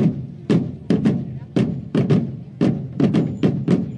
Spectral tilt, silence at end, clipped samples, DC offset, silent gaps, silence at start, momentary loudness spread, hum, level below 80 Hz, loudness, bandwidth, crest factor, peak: -9 dB/octave; 0 s; under 0.1%; under 0.1%; none; 0 s; 5 LU; none; -52 dBFS; -21 LUFS; 9.6 kHz; 14 dB; -6 dBFS